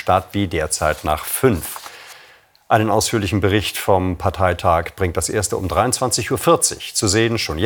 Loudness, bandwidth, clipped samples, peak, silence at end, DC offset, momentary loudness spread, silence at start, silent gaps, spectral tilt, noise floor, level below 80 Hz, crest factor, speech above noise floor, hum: -18 LUFS; over 20 kHz; under 0.1%; 0 dBFS; 0 s; under 0.1%; 6 LU; 0 s; none; -4 dB/octave; -49 dBFS; -42 dBFS; 18 dB; 31 dB; none